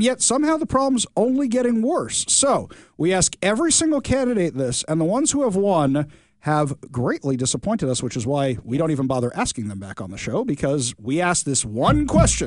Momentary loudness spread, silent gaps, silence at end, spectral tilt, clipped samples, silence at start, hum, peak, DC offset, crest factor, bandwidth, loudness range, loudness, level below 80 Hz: 8 LU; none; 0 s; -4.5 dB/octave; under 0.1%; 0 s; none; -2 dBFS; 0.1%; 18 dB; 11 kHz; 4 LU; -20 LUFS; -38 dBFS